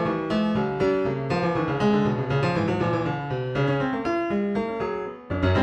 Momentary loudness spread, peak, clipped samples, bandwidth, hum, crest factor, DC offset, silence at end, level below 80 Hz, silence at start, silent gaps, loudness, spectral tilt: 5 LU; -10 dBFS; under 0.1%; 8.6 kHz; none; 14 dB; under 0.1%; 0 s; -46 dBFS; 0 s; none; -25 LUFS; -8 dB/octave